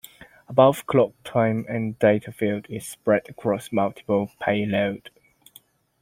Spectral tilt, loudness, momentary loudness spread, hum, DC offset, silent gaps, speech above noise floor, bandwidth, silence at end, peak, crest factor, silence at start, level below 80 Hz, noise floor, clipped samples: -6.5 dB/octave; -23 LUFS; 10 LU; none; under 0.1%; none; 32 dB; 16.5 kHz; 1.05 s; -2 dBFS; 22 dB; 0.5 s; -62 dBFS; -55 dBFS; under 0.1%